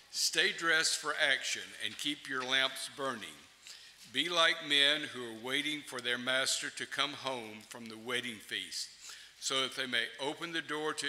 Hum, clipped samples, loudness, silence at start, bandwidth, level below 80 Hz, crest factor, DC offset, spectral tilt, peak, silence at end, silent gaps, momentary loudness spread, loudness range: none; under 0.1%; -32 LUFS; 0.1 s; 16 kHz; -80 dBFS; 22 dB; under 0.1%; -0.5 dB/octave; -12 dBFS; 0 s; none; 18 LU; 6 LU